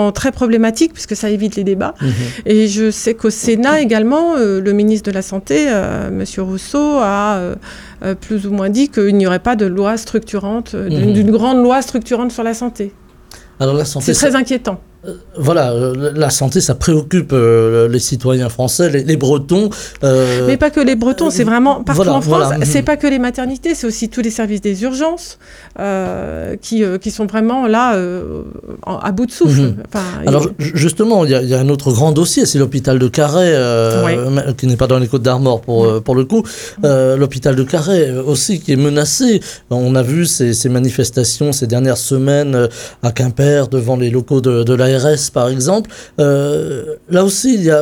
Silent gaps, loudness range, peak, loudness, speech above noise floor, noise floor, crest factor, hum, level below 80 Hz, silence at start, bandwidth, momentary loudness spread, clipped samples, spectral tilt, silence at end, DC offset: none; 4 LU; 0 dBFS; -14 LUFS; 26 dB; -39 dBFS; 12 dB; none; -38 dBFS; 0 s; 18 kHz; 8 LU; under 0.1%; -5.5 dB/octave; 0 s; under 0.1%